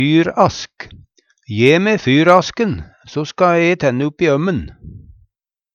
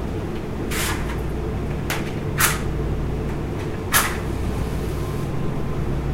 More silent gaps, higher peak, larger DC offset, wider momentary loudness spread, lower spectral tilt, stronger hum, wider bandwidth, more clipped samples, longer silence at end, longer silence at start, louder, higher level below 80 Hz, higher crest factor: neither; about the same, 0 dBFS vs 0 dBFS; neither; first, 16 LU vs 8 LU; first, -6 dB/octave vs -4.5 dB/octave; neither; second, 8.2 kHz vs 16 kHz; neither; first, 0.75 s vs 0 s; about the same, 0 s vs 0 s; first, -14 LUFS vs -24 LUFS; second, -44 dBFS vs -30 dBFS; second, 16 dB vs 22 dB